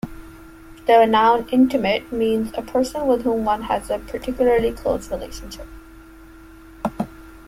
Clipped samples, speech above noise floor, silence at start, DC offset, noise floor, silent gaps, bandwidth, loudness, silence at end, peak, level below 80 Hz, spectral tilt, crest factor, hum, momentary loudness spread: under 0.1%; 24 dB; 0.05 s; under 0.1%; -43 dBFS; none; 16 kHz; -20 LUFS; 0.1 s; -4 dBFS; -42 dBFS; -5.5 dB/octave; 18 dB; none; 16 LU